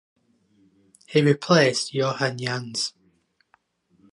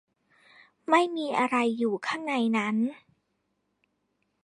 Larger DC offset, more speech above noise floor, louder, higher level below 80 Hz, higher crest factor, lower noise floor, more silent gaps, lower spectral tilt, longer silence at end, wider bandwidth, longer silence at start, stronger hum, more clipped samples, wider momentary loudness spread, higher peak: neither; second, 44 dB vs 50 dB; first, -22 LUFS vs -27 LUFS; first, -70 dBFS vs -80 dBFS; about the same, 20 dB vs 22 dB; second, -65 dBFS vs -77 dBFS; neither; about the same, -4.5 dB/octave vs -5 dB/octave; second, 1.25 s vs 1.5 s; about the same, 11.5 kHz vs 10.5 kHz; first, 1.1 s vs 0.9 s; neither; neither; first, 10 LU vs 6 LU; first, -4 dBFS vs -8 dBFS